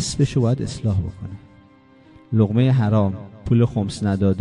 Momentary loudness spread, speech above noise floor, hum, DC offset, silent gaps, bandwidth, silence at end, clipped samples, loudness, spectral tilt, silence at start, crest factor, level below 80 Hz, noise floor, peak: 15 LU; 31 dB; none; under 0.1%; none; 11 kHz; 0 s; under 0.1%; -20 LUFS; -7 dB/octave; 0 s; 16 dB; -38 dBFS; -50 dBFS; -4 dBFS